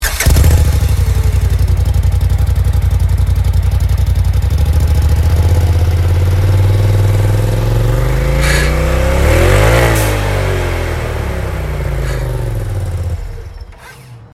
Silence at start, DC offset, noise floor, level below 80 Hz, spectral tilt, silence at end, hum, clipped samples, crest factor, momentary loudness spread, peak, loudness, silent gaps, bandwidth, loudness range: 0 s; under 0.1%; -34 dBFS; -16 dBFS; -5.5 dB/octave; 0.1 s; none; under 0.1%; 12 dB; 9 LU; 0 dBFS; -13 LUFS; none; 16 kHz; 6 LU